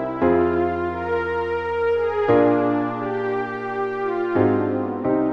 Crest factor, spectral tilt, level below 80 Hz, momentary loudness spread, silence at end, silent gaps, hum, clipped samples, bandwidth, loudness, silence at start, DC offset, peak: 16 dB; -9 dB/octave; -50 dBFS; 7 LU; 0 s; none; none; under 0.1%; 6.2 kHz; -21 LUFS; 0 s; 0.1%; -4 dBFS